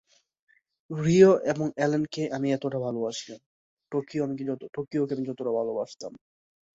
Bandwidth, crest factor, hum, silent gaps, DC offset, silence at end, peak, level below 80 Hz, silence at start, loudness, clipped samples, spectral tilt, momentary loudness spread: 7.8 kHz; 22 dB; none; 3.46-3.77 s; under 0.1%; 0.55 s; -4 dBFS; -66 dBFS; 0.9 s; -27 LUFS; under 0.1%; -6.5 dB/octave; 18 LU